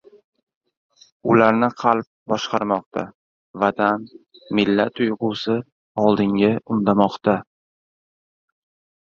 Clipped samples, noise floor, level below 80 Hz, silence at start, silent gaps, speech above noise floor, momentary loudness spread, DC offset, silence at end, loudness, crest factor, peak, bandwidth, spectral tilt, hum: under 0.1%; under -90 dBFS; -58 dBFS; 1.25 s; 2.07-2.26 s, 2.86-2.91 s, 3.14-3.54 s, 5.72-5.95 s; over 71 dB; 10 LU; under 0.1%; 1.6 s; -20 LUFS; 20 dB; -2 dBFS; 7 kHz; -6.5 dB/octave; none